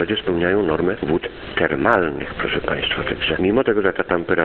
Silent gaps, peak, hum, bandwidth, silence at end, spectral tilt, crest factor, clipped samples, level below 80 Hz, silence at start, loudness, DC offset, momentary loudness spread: none; 0 dBFS; none; 4.5 kHz; 0 s; -8 dB/octave; 20 dB; under 0.1%; -40 dBFS; 0 s; -20 LUFS; under 0.1%; 5 LU